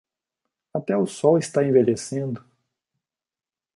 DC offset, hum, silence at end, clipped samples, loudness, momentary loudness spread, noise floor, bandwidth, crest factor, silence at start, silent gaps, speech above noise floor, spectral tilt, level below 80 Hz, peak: under 0.1%; none; 1.4 s; under 0.1%; -22 LUFS; 13 LU; under -90 dBFS; 11.5 kHz; 20 dB; 0.75 s; none; over 69 dB; -6.5 dB/octave; -68 dBFS; -4 dBFS